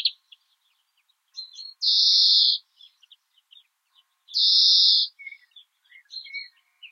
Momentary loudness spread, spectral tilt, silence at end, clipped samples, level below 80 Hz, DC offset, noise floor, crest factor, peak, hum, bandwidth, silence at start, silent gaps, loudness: 24 LU; 9.5 dB/octave; 0.05 s; under 0.1%; under -90 dBFS; under 0.1%; -71 dBFS; 20 dB; -4 dBFS; none; 12 kHz; 0 s; none; -17 LUFS